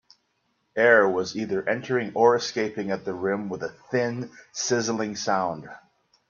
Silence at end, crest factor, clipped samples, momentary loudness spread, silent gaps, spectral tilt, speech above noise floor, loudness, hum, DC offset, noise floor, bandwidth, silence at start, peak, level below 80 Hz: 0.5 s; 22 dB; under 0.1%; 15 LU; none; -4 dB/octave; 48 dB; -25 LUFS; none; under 0.1%; -72 dBFS; 7.4 kHz; 0.75 s; -4 dBFS; -68 dBFS